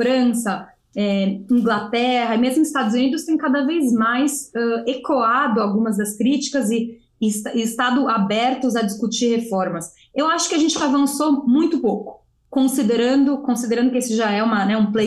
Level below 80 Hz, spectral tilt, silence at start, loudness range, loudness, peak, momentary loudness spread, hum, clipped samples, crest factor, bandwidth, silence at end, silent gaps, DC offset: -62 dBFS; -4.5 dB/octave; 0 s; 2 LU; -19 LUFS; -8 dBFS; 6 LU; none; under 0.1%; 10 dB; 12.5 kHz; 0 s; none; under 0.1%